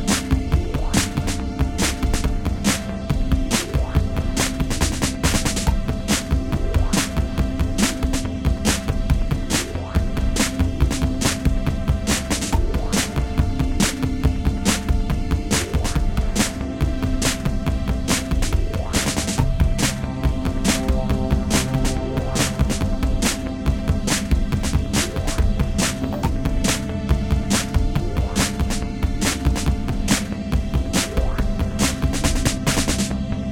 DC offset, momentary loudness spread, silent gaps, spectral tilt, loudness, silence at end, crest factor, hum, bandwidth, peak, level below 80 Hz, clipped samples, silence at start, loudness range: under 0.1%; 4 LU; none; -4.5 dB/octave; -22 LUFS; 0 s; 18 dB; none; 17 kHz; -2 dBFS; -24 dBFS; under 0.1%; 0 s; 1 LU